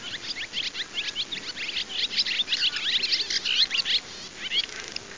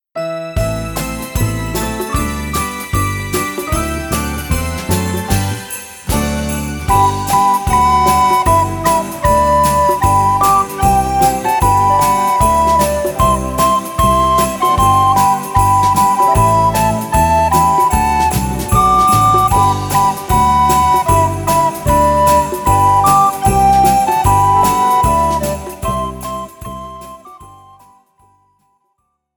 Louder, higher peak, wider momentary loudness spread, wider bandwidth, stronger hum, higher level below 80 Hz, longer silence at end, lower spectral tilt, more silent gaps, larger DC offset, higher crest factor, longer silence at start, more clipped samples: second, -25 LUFS vs -13 LUFS; second, -10 dBFS vs 0 dBFS; about the same, 10 LU vs 9 LU; second, 7.8 kHz vs 19.5 kHz; neither; second, -62 dBFS vs -26 dBFS; second, 0 s vs 1.85 s; second, 0.5 dB/octave vs -5 dB/octave; neither; first, 0.3% vs under 0.1%; about the same, 18 dB vs 14 dB; second, 0 s vs 0.15 s; neither